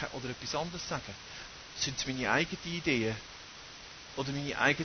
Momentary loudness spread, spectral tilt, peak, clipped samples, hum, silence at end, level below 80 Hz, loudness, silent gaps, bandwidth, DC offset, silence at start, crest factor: 17 LU; -3.5 dB/octave; -12 dBFS; under 0.1%; none; 0 s; -58 dBFS; -34 LUFS; none; 6.6 kHz; under 0.1%; 0 s; 24 dB